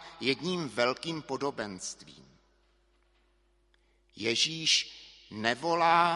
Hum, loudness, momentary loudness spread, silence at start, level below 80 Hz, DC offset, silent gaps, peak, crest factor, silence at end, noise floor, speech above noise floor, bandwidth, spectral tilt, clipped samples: none; -29 LUFS; 16 LU; 0 s; -68 dBFS; under 0.1%; none; -8 dBFS; 24 dB; 0 s; -69 dBFS; 39 dB; 11.5 kHz; -2.5 dB/octave; under 0.1%